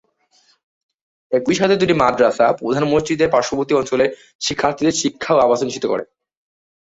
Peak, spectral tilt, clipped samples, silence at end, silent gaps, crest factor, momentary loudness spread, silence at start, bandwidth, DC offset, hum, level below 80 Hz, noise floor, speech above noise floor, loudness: -2 dBFS; -4.5 dB/octave; under 0.1%; 0.9 s; 4.35-4.39 s; 16 dB; 7 LU; 1.3 s; 8 kHz; under 0.1%; none; -52 dBFS; -58 dBFS; 42 dB; -17 LUFS